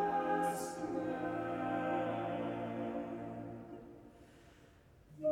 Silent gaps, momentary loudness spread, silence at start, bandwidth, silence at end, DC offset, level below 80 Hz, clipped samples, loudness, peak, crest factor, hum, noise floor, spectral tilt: none; 17 LU; 0 s; 17.5 kHz; 0 s; under 0.1%; -68 dBFS; under 0.1%; -39 LUFS; -22 dBFS; 16 dB; none; -62 dBFS; -6 dB/octave